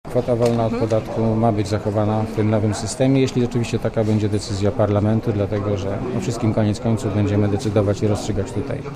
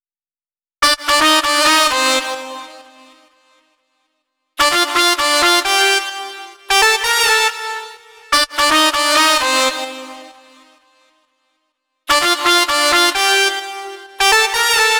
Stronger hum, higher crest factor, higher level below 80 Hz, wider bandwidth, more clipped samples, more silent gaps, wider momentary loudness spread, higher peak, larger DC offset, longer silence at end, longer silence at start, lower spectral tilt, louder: neither; about the same, 14 dB vs 16 dB; first, -38 dBFS vs -48 dBFS; second, 13 kHz vs over 20 kHz; neither; neither; second, 5 LU vs 17 LU; second, -6 dBFS vs 0 dBFS; neither; about the same, 0 s vs 0 s; second, 0.05 s vs 0.8 s; first, -7 dB/octave vs 1 dB/octave; second, -20 LUFS vs -13 LUFS